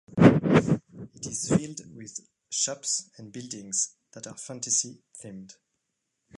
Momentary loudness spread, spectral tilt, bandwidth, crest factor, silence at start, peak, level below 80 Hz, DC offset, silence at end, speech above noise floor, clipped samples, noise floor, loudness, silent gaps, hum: 22 LU; -4.5 dB/octave; 11.5 kHz; 24 dB; 0.15 s; -2 dBFS; -56 dBFS; under 0.1%; 0.95 s; 49 dB; under 0.1%; -80 dBFS; -25 LUFS; none; none